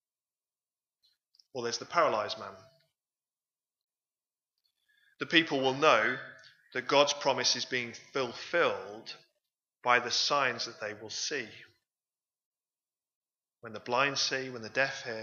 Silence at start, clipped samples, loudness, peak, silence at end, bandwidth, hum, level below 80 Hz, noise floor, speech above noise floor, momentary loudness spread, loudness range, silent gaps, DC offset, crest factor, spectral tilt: 1.55 s; under 0.1%; -30 LUFS; -8 dBFS; 0 s; 7.4 kHz; none; -84 dBFS; under -90 dBFS; over 59 dB; 18 LU; 8 LU; 3.84-3.88 s, 12.45-12.52 s, 13.15-13.22 s; under 0.1%; 26 dB; -2 dB/octave